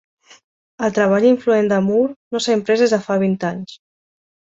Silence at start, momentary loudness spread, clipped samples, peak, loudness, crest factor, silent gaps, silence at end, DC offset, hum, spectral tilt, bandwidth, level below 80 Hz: 0.8 s; 9 LU; under 0.1%; -2 dBFS; -17 LUFS; 16 dB; 2.16-2.31 s; 0.75 s; under 0.1%; none; -5.5 dB/octave; 8 kHz; -62 dBFS